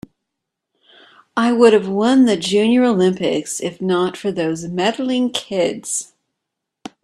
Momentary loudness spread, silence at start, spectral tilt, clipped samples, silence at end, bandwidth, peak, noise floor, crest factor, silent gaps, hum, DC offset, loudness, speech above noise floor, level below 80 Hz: 10 LU; 1.35 s; -4.5 dB/octave; under 0.1%; 1 s; 13 kHz; 0 dBFS; -80 dBFS; 18 dB; none; none; under 0.1%; -17 LUFS; 63 dB; -60 dBFS